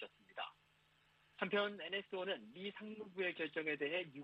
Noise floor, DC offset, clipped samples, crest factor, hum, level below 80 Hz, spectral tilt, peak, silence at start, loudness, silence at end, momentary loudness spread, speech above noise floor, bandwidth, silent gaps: -74 dBFS; under 0.1%; under 0.1%; 20 dB; none; -88 dBFS; -6 dB/octave; -24 dBFS; 0 s; -43 LUFS; 0 s; 11 LU; 31 dB; 8.6 kHz; none